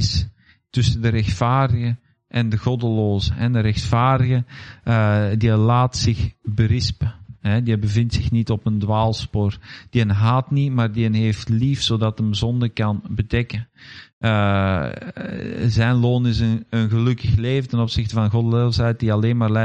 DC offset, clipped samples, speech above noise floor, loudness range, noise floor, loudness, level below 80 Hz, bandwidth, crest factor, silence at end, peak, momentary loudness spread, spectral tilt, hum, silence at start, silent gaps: under 0.1%; under 0.1%; 24 dB; 3 LU; -42 dBFS; -20 LUFS; -38 dBFS; 8.6 kHz; 14 dB; 0 s; -4 dBFS; 9 LU; -6.5 dB/octave; none; 0 s; 14.13-14.21 s